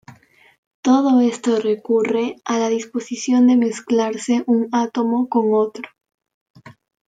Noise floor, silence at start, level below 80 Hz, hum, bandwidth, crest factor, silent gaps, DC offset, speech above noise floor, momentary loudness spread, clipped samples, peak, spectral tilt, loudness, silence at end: -46 dBFS; 0.1 s; -72 dBFS; none; 9.2 kHz; 14 dB; 0.58-0.83 s, 6.34-6.54 s; under 0.1%; 29 dB; 10 LU; under 0.1%; -6 dBFS; -5 dB/octave; -18 LUFS; 0.4 s